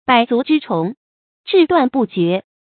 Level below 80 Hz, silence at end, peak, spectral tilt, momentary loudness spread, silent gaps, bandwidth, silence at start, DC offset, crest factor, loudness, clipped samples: -58 dBFS; 0.2 s; 0 dBFS; -11 dB/octave; 8 LU; 0.97-1.44 s; 4.6 kHz; 0.1 s; under 0.1%; 16 dB; -16 LUFS; under 0.1%